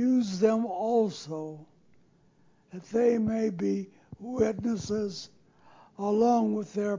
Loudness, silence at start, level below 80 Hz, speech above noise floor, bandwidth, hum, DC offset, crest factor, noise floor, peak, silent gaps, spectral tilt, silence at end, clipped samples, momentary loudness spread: -28 LUFS; 0 s; -62 dBFS; 35 dB; 7.6 kHz; none; under 0.1%; 18 dB; -63 dBFS; -12 dBFS; none; -6.5 dB/octave; 0 s; under 0.1%; 19 LU